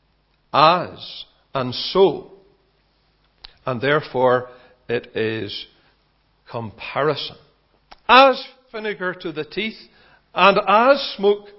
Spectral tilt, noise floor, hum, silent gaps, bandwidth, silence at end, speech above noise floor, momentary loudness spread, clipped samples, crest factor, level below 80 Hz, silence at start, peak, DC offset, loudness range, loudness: -7 dB/octave; -63 dBFS; none; none; 6.4 kHz; 0.15 s; 44 dB; 18 LU; under 0.1%; 20 dB; -58 dBFS; 0.55 s; 0 dBFS; under 0.1%; 7 LU; -19 LUFS